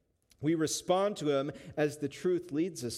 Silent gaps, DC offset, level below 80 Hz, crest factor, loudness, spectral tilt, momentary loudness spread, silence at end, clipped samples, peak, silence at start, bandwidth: none; under 0.1%; -70 dBFS; 16 dB; -32 LUFS; -5 dB/octave; 5 LU; 0 s; under 0.1%; -16 dBFS; 0.4 s; 15.5 kHz